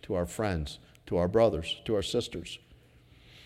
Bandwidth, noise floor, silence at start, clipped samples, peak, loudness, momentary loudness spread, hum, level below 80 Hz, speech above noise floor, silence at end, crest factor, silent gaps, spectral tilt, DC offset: 15.5 kHz; -58 dBFS; 0.05 s; under 0.1%; -12 dBFS; -30 LUFS; 17 LU; none; -48 dBFS; 28 dB; 0.05 s; 20 dB; none; -5.5 dB/octave; under 0.1%